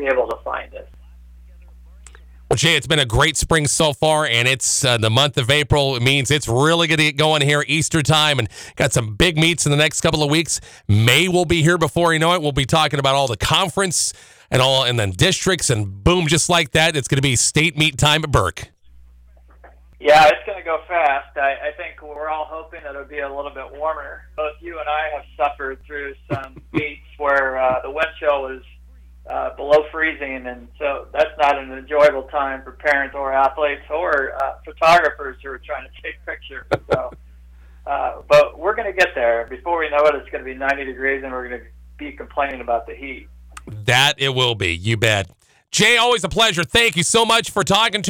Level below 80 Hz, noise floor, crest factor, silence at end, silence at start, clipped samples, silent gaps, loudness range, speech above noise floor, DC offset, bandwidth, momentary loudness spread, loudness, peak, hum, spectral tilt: -40 dBFS; -47 dBFS; 14 dB; 0 s; 0 s; under 0.1%; none; 9 LU; 29 dB; under 0.1%; over 20 kHz; 15 LU; -17 LUFS; -6 dBFS; none; -3.5 dB/octave